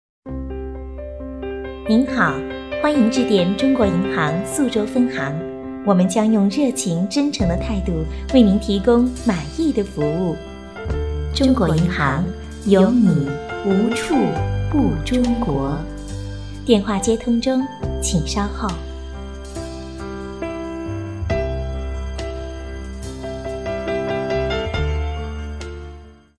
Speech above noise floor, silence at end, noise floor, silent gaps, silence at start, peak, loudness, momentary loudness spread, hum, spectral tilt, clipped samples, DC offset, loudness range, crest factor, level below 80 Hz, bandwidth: 23 dB; 0.25 s; -40 dBFS; none; 0.25 s; 0 dBFS; -20 LUFS; 15 LU; none; -6 dB/octave; under 0.1%; 0.2%; 9 LU; 20 dB; -32 dBFS; 11 kHz